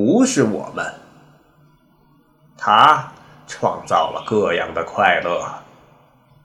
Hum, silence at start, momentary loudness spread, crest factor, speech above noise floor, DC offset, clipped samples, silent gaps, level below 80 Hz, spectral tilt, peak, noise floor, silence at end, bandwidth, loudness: none; 0 s; 17 LU; 20 dB; 38 dB; under 0.1%; under 0.1%; none; -58 dBFS; -4 dB/octave; 0 dBFS; -55 dBFS; 0.85 s; 13 kHz; -18 LUFS